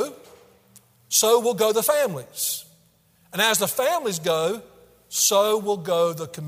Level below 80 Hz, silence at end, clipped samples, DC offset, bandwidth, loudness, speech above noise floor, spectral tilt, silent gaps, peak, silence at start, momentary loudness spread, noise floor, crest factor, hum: -68 dBFS; 0 s; under 0.1%; under 0.1%; 16 kHz; -22 LUFS; 38 dB; -2 dB/octave; none; -4 dBFS; 0 s; 10 LU; -60 dBFS; 20 dB; none